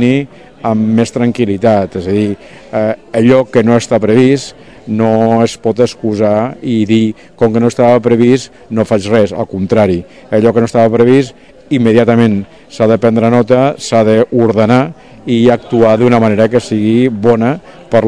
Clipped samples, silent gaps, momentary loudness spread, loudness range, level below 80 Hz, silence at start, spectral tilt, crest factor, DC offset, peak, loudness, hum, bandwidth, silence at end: 2%; none; 8 LU; 2 LU; -46 dBFS; 0 s; -7 dB/octave; 10 dB; 0.8%; 0 dBFS; -11 LUFS; none; 10.5 kHz; 0 s